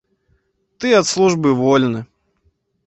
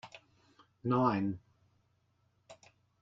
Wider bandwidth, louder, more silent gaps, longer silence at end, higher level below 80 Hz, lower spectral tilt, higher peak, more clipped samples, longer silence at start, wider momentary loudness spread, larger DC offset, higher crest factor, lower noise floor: about the same, 8.2 kHz vs 7.8 kHz; first, -15 LUFS vs -33 LUFS; neither; first, 0.85 s vs 0.5 s; first, -56 dBFS vs -72 dBFS; second, -5 dB/octave vs -8.5 dB/octave; first, -2 dBFS vs -16 dBFS; neither; first, 0.8 s vs 0.05 s; second, 9 LU vs 18 LU; neither; second, 16 dB vs 22 dB; second, -63 dBFS vs -75 dBFS